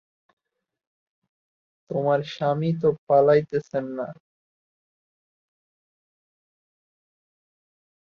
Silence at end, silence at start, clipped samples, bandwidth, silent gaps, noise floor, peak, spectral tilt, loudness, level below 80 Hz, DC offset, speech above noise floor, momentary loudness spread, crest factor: 4.05 s; 1.9 s; under 0.1%; 6.8 kHz; 2.98-3.07 s; -84 dBFS; -6 dBFS; -8 dB/octave; -23 LUFS; -70 dBFS; under 0.1%; 61 dB; 14 LU; 20 dB